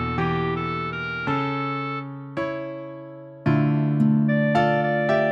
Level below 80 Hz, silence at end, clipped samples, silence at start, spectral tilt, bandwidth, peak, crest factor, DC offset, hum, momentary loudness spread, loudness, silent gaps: -50 dBFS; 0 s; under 0.1%; 0 s; -8.5 dB/octave; 7 kHz; -8 dBFS; 14 dB; under 0.1%; none; 13 LU; -23 LUFS; none